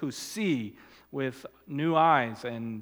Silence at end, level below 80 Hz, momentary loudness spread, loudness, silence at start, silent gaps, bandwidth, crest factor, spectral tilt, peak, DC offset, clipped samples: 0 s; -72 dBFS; 17 LU; -28 LUFS; 0 s; none; 19 kHz; 20 dB; -5.5 dB/octave; -10 dBFS; under 0.1%; under 0.1%